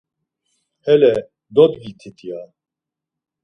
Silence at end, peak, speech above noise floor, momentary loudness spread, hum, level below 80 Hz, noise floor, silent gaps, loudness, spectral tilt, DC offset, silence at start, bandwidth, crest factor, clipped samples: 1 s; 0 dBFS; 69 dB; 21 LU; none; -60 dBFS; -85 dBFS; none; -15 LUFS; -7.5 dB/octave; under 0.1%; 0.85 s; 6.2 kHz; 20 dB; under 0.1%